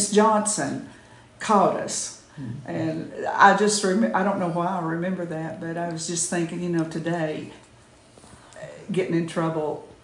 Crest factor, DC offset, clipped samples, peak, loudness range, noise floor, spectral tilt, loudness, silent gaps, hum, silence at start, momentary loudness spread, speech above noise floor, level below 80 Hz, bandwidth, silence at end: 22 dB; under 0.1%; under 0.1%; -2 dBFS; 7 LU; -52 dBFS; -4.5 dB/octave; -24 LUFS; none; none; 0 s; 17 LU; 29 dB; -64 dBFS; 11.5 kHz; 0.1 s